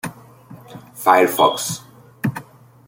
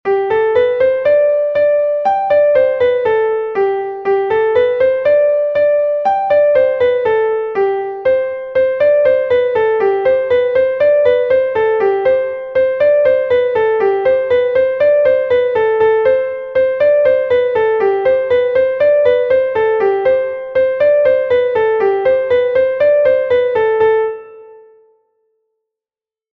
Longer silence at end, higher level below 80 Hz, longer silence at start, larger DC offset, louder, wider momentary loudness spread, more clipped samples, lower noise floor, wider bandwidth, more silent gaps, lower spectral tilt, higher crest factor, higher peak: second, 0.45 s vs 1.8 s; second, -62 dBFS vs -50 dBFS; about the same, 0.05 s vs 0.05 s; neither; second, -18 LUFS vs -13 LUFS; first, 24 LU vs 4 LU; neither; second, -42 dBFS vs under -90 dBFS; first, 17 kHz vs 4.8 kHz; neither; second, -4 dB/octave vs -6.5 dB/octave; first, 18 dB vs 12 dB; about the same, -2 dBFS vs -2 dBFS